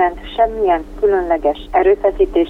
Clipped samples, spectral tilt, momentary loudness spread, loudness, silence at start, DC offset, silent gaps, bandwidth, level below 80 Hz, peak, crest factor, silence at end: under 0.1%; -7 dB/octave; 3 LU; -16 LUFS; 0 s; under 0.1%; none; 4.3 kHz; -34 dBFS; -2 dBFS; 12 dB; 0 s